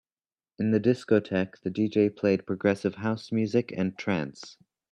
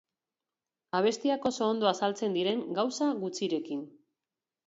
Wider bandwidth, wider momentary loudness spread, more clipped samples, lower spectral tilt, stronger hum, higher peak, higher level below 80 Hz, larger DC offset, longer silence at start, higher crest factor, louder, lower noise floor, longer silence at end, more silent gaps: first, 10 kHz vs 8 kHz; about the same, 7 LU vs 7 LU; neither; first, -7.5 dB/octave vs -4.5 dB/octave; neither; first, -8 dBFS vs -12 dBFS; first, -68 dBFS vs -76 dBFS; neither; second, 0.6 s vs 0.95 s; about the same, 20 dB vs 20 dB; first, -27 LUFS vs -30 LUFS; about the same, under -90 dBFS vs under -90 dBFS; second, 0.4 s vs 0.8 s; neither